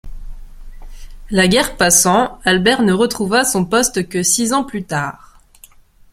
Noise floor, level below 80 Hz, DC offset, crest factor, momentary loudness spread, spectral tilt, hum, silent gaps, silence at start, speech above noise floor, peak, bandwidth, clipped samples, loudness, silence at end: -45 dBFS; -36 dBFS; under 0.1%; 16 dB; 10 LU; -3 dB/octave; none; none; 0.05 s; 30 dB; 0 dBFS; 16.5 kHz; under 0.1%; -14 LUFS; 0.95 s